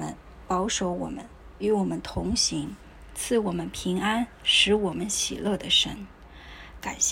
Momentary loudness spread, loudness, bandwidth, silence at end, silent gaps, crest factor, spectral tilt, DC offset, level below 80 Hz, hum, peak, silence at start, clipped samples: 19 LU; -25 LUFS; 16 kHz; 0 s; none; 20 dB; -2.5 dB/octave; under 0.1%; -46 dBFS; none; -8 dBFS; 0 s; under 0.1%